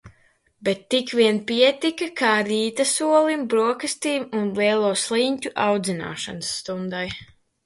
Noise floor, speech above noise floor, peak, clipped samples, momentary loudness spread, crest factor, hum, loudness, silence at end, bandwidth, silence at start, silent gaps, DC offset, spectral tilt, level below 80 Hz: -61 dBFS; 39 dB; -4 dBFS; under 0.1%; 10 LU; 18 dB; none; -22 LUFS; 0.4 s; 12 kHz; 0.05 s; none; under 0.1%; -3.5 dB/octave; -60 dBFS